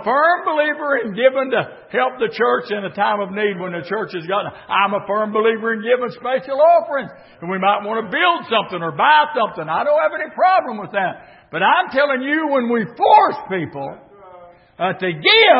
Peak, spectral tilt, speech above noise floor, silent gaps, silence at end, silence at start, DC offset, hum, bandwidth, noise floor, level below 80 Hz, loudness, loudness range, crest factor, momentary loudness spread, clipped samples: 0 dBFS; -9.5 dB/octave; 26 dB; none; 0 s; 0 s; under 0.1%; none; 5.8 kHz; -43 dBFS; -66 dBFS; -18 LUFS; 3 LU; 16 dB; 11 LU; under 0.1%